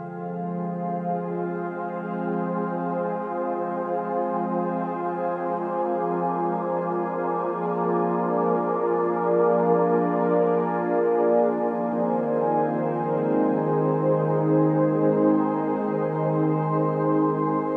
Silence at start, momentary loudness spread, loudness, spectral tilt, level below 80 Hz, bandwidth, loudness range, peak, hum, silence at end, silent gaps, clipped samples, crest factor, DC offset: 0 s; 7 LU; -24 LUFS; -11.5 dB/octave; -72 dBFS; 4.4 kHz; 5 LU; -10 dBFS; none; 0 s; none; under 0.1%; 14 dB; under 0.1%